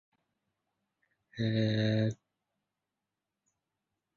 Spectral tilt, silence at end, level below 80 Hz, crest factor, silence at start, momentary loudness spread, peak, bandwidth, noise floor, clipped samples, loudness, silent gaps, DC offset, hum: -7.5 dB/octave; 2 s; -68 dBFS; 18 dB; 1.35 s; 19 LU; -20 dBFS; 7 kHz; -88 dBFS; under 0.1%; -32 LUFS; none; under 0.1%; none